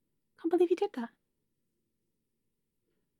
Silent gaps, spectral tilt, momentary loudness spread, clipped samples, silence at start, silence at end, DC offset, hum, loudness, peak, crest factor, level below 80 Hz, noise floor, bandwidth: none; -5.5 dB/octave; 14 LU; under 0.1%; 0.45 s; 2.1 s; under 0.1%; none; -31 LUFS; -18 dBFS; 20 dB; -90 dBFS; -84 dBFS; 11 kHz